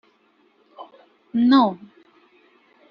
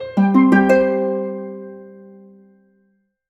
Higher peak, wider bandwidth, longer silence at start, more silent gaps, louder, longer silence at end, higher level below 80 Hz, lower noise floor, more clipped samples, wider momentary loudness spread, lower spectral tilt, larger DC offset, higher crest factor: about the same, -4 dBFS vs -2 dBFS; second, 5.6 kHz vs 8 kHz; first, 0.8 s vs 0 s; neither; second, -19 LUFS vs -15 LUFS; second, 1.15 s vs 1.4 s; second, -70 dBFS vs -56 dBFS; about the same, -61 dBFS vs -64 dBFS; neither; first, 28 LU vs 21 LU; second, -3.5 dB/octave vs -8.5 dB/octave; neither; about the same, 20 dB vs 16 dB